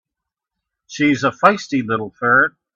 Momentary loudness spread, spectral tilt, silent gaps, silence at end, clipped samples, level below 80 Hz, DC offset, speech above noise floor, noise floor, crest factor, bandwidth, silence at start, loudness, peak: 8 LU; -5 dB/octave; none; 0.25 s; under 0.1%; -60 dBFS; under 0.1%; 67 dB; -83 dBFS; 18 dB; 7.6 kHz; 0.9 s; -17 LUFS; 0 dBFS